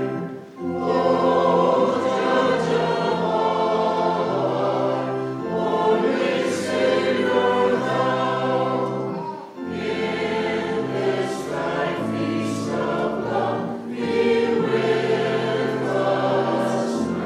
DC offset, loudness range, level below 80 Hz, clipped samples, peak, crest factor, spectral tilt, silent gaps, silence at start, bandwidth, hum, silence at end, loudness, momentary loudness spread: under 0.1%; 4 LU; -62 dBFS; under 0.1%; -6 dBFS; 14 dB; -6 dB/octave; none; 0 s; 12.5 kHz; none; 0 s; -22 LUFS; 7 LU